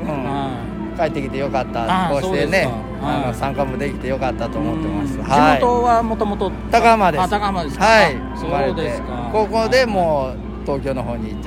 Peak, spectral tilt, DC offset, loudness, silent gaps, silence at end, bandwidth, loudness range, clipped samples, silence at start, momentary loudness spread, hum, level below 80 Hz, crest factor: 0 dBFS; -6 dB/octave; under 0.1%; -18 LUFS; none; 0 s; 16 kHz; 5 LU; under 0.1%; 0 s; 10 LU; none; -32 dBFS; 18 dB